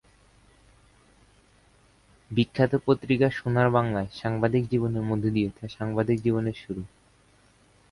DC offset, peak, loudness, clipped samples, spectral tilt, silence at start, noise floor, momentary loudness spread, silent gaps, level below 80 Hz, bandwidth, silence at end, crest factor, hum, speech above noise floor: under 0.1%; -8 dBFS; -26 LUFS; under 0.1%; -8.5 dB/octave; 2.3 s; -60 dBFS; 10 LU; none; -54 dBFS; 11.5 kHz; 1.05 s; 20 dB; none; 35 dB